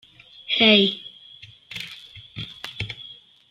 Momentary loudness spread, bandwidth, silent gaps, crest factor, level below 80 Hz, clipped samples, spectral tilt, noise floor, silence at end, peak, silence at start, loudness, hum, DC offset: 26 LU; 13 kHz; none; 22 dB; -58 dBFS; under 0.1%; -5 dB/octave; -47 dBFS; 0.35 s; -2 dBFS; 0.5 s; -19 LUFS; none; under 0.1%